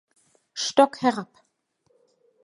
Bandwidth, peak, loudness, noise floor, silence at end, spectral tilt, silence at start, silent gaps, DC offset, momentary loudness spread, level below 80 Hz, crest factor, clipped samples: 11.5 kHz; -2 dBFS; -23 LUFS; -70 dBFS; 1.2 s; -3 dB/octave; 0.55 s; none; under 0.1%; 19 LU; -74 dBFS; 24 dB; under 0.1%